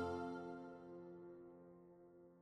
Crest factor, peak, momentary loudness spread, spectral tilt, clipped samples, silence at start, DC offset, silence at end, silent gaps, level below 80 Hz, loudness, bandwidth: 18 dB; -34 dBFS; 17 LU; -7.5 dB/octave; under 0.1%; 0 s; under 0.1%; 0 s; none; -76 dBFS; -52 LUFS; 12 kHz